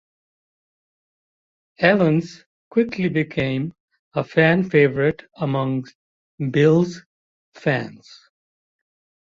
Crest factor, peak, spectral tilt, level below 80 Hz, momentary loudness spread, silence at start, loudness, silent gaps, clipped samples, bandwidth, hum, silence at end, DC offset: 20 dB; -2 dBFS; -7.5 dB/octave; -58 dBFS; 12 LU; 1.8 s; -20 LUFS; 2.46-2.71 s, 3.80-3.88 s, 3.99-4.11 s, 5.95-6.38 s, 7.06-7.52 s; under 0.1%; 7.4 kHz; none; 1.3 s; under 0.1%